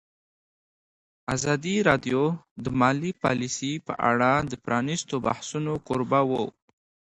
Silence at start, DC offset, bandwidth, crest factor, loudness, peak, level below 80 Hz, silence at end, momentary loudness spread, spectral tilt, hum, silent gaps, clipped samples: 1.3 s; under 0.1%; 11 kHz; 22 dB; -26 LUFS; -4 dBFS; -56 dBFS; 0.7 s; 8 LU; -5 dB/octave; none; 2.51-2.56 s; under 0.1%